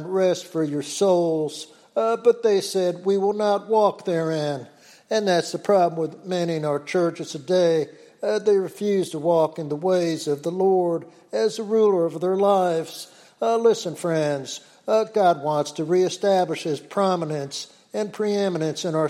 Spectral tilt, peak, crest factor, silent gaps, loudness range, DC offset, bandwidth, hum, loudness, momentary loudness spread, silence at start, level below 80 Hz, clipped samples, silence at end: -5.5 dB/octave; -6 dBFS; 16 dB; none; 2 LU; under 0.1%; 14 kHz; none; -23 LUFS; 10 LU; 0 s; -76 dBFS; under 0.1%; 0 s